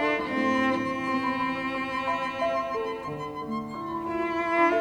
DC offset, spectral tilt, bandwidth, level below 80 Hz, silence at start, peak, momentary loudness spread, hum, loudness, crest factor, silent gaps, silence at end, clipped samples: under 0.1%; -5.5 dB/octave; 12 kHz; -58 dBFS; 0 s; -12 dBFS; 9 LU; none; -28 LUFS; 16 dB; none; 0 s; under 0.1%